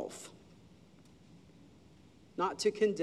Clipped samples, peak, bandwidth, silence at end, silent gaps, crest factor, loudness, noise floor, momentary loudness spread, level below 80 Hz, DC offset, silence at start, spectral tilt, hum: under 0.1%; -18 dBFS; 13 kHz; 0 s; none; 20 dB; -34 LUFS; -60 dBFS; 27 LU; -72 dBFS; under 0.1%; 0 s; -4 dB/octave; none